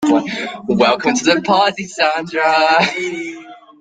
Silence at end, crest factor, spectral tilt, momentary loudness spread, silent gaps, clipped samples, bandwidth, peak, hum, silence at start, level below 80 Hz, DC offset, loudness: 0.25 s; 16 dB; -3.5 dB/octave; 11 LU; none; under 0.1%; 9.4 kHz; 0 dBFS; none; 0 s; -58 dBFS; under 0.1%; -15 LUFS